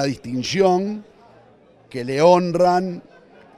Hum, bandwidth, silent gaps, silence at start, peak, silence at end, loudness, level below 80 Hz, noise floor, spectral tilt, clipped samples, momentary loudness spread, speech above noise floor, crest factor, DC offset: none; 12 kHz; none; 0 s; -2 dBFS; 0.55 s; -19 LUFS; -58 dBFS; -51 dBFS; -6 dB/octave; under 0.1%; 18 LU; 33 dB; 18 dB; under 0.1%